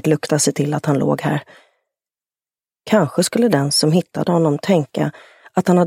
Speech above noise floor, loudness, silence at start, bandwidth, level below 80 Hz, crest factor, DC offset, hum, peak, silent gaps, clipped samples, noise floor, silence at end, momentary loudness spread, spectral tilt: over 73 dB; -18 LUFS; 0.05 s; 16 kHz; -60 dBFS; 18 dB; under 0.1%; none; 0 dBFS; none; under 0.1%; under -90 dBFS; 0 s; 7 LU; -5 dB/octave